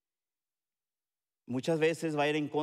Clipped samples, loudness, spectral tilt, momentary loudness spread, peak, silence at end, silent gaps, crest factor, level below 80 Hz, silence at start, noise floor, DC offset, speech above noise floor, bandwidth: under 0.1%; -31 LUFS; -5.5 dB/octave; 7 LU; -18 dBFS; 0 s; none; 16 dB; -86 dBFS; 1.5 s; under -90 dBFS; under 0.1%; over 59 dB; 13.5 kHz